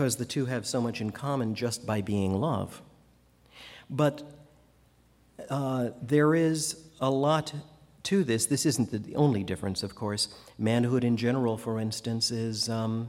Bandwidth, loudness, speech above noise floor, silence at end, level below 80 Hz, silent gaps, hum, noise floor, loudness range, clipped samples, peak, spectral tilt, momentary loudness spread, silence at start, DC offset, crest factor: 16.5 kHz; -29 LUFS; 34 dB; 0 s; -64 dBFS; none; none; -62 dBFS; 6 LU; under 0.1%; -10 dBFS; -5 dB/octave; 10 LU; 0 s; under 0.1%; 18 dB